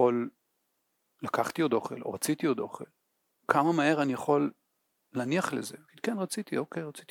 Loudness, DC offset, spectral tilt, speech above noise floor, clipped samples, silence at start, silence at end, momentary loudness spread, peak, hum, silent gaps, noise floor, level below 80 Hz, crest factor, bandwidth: -30 LUFS; under 0.1%; -5 dB/octave; 48 dB; under 0.1%; 0 s; 0.1 s; 14 LU; -6 dBFS; none; none; -78 dBFS; -80 dBFS; 26 dB; 18.5 kHz